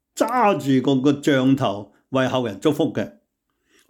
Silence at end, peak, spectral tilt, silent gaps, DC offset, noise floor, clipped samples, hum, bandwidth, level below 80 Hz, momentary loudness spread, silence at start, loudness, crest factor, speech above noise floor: 0.8 s; -6 dBFS; -6 dB/octave; none; under 0.1%; -72 dBFS; under 0.1%; none; 18 kHz; -64 dBFS; 8 LU; 0.15 s; -20 LUFS; 14 dB; 52 dB